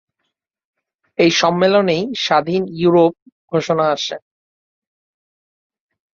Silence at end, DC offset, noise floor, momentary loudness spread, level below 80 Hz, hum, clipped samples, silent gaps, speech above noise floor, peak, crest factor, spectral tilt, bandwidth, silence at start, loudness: 1.95 s; under 0.1%; -75 dBFS; 9 LU; -60 dBFS; none; under 0.1%; 3.22-3.26 s, 3.32-3.48 s; 60 dB; -2 dBFS; 18 dB; -5 dB/octave; 7.6 kHz; 1.2 s; -16 LUFS